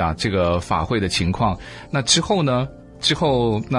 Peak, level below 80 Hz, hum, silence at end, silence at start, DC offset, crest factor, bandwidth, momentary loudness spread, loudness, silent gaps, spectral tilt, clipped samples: -2 dBFS; -40 dBFS; none; 0 s; 0 s; under 0.1%; 18 dB; 11.5 kHz; 7 LU; -20 LUFS; none; -4.5 dB/octave; under 0.1%